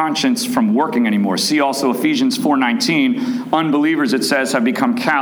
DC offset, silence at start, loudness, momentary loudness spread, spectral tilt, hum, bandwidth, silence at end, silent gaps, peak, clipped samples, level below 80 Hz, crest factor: under 0.1%; 0 s; -16 LUFS; 2 LU; -4 dB/octave; none; over 20 kHz; 0 s; none; -2 dBFS; under 0.1%; -66 dBFS; 14 dB